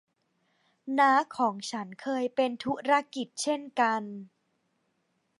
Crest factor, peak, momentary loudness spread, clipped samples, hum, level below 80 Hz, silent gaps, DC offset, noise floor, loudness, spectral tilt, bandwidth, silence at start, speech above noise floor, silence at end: 20 dB; -10 dBFS; 13 LU; under 0.1%; none; -78 dBFS; none; under 0.1%; -76 dBFS; -28 LUFS; -3.5 dB/octave; 11.5 kHz; 0.85 s; 47 dB; 1.15 s